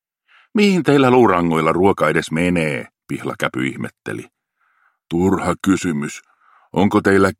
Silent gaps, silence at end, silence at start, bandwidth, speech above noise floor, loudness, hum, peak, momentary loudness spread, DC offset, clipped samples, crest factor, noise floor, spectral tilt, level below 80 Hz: none; 0.05 s; 0.55 s; 15.5 kHz; 46 dB; -17 LUFS; none; 0 dBFS; 16 LU; under 0.1%; under 0.1%; 18 dB; -63 dBFS; -6 dB/octave; -52 dBFS